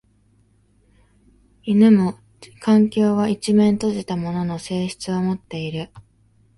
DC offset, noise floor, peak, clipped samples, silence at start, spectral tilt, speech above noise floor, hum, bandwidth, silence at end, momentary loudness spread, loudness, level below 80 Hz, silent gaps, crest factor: under 0.1%; -59 dBFS; -4 dBFS; under 0.1%; 1.65 s; -7 dB/octave; 40 dB; none; 11.5 kHz; 0.6 s; 13 LU; -20 LUFS; -56 dBFS; none; 16 dB